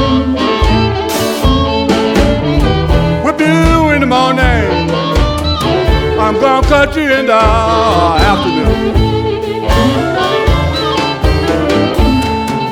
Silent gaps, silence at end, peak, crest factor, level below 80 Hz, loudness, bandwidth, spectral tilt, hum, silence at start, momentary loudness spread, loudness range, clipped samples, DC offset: none; 0 s; 0 dBFS; 10 dB; -18 dBFS; -11 LUFS; 17.5 kHz; -6 dB/octave; none; 0 s; 4 LU; 2 LU; under 0.1%; under 0.1%